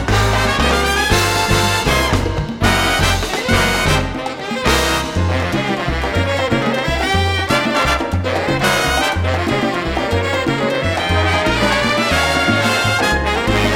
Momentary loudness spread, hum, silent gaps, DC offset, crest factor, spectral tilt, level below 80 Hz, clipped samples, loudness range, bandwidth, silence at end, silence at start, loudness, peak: 4 LU; none; none; under 0.1%; 14 dB; -4 dB/octave; -26 dBFS; under 0.1%; 2 LU; 17 kHz; 0 s; 0 s; -16 LUFS; -2 dBFS